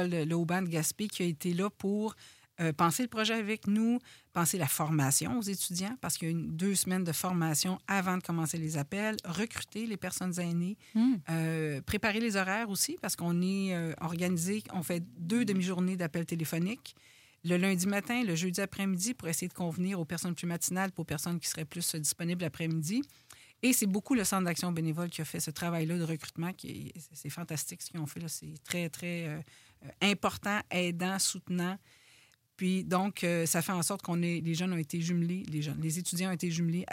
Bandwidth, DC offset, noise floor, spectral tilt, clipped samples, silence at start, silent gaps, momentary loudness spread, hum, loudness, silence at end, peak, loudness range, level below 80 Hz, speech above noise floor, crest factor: 16.5 kHz; under 0.1%; -64 dBFS; -4.5 dB/octave; under 0.1%; 0 s; none; 8 LU; none; -32 LUFS; 0 s; -14 dBFS; 4 LU; -66 dBFS; 31 dB; 20 dB